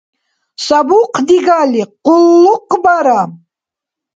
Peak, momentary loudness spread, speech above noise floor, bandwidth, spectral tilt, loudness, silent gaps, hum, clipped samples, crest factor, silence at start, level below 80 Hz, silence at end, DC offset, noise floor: 0 dBFS; 7 LU; 75 dB; 7.8 kHz; -5 dB/octave; -10 LUFS; none; none; under 0.1%; 12 dB; 0.6 s; -56 dBFS; 0.8 s; under 0.1%; -84 dBFS